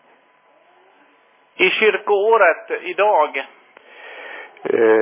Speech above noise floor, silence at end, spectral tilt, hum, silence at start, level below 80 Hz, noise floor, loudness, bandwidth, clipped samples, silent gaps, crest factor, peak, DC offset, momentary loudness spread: 39 dB; 0 s; -7 dB/octave; none; 1.6 s; -78 dBFS; -55 dBFS; -17 LUFS; 3.8 kHz; under 0.1%; none; 18 dB; -2 dBFS; under 0.1%; 20 LU